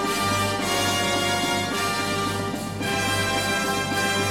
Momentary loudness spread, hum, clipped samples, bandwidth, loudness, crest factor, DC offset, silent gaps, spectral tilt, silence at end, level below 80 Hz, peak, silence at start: 4 LU; none; under 0.1%; 17.5 kHz; -23 LUFS; 14 dB; 0.2%; none; -3 dB/octave; 0 s; -50 dBFS; -10 dBFS; 0 s